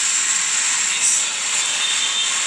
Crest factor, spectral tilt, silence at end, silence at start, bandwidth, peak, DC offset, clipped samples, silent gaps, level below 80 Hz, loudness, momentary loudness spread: 14 dB; 3.5 dB/octave; 0 s; 0 s; 10.5 kHz; -6 dBFS; under 0.1%; under 0.1%; none; -86 dBFS; -16 LUFS; 2 LU